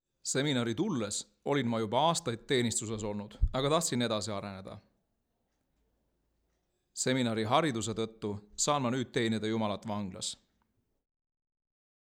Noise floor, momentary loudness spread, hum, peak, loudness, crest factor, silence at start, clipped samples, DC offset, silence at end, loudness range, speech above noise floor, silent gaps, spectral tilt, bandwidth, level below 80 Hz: -80 dBFS; 10 LU; none; -12 dBFS; -32 LUFS; 22 dB; 0.25 s; under 0.1%; under 0.1%; 1.7 s; 5 LU; 48 dB; none; -4 dB/octave; 17 kHz; -46 dBFS